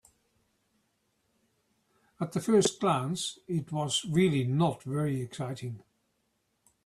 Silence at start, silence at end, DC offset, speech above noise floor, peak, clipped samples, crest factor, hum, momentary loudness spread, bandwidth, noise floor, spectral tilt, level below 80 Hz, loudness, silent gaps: 2.2 s; 1.05 s; under 0.1%; 47 dB; -14 dBFS; under 0.1%; 18 dB; none; 12 LU; 14 kHz; -76 dBFS; -5.5 dB/octave; -68 dBFS; -30 LUFS; none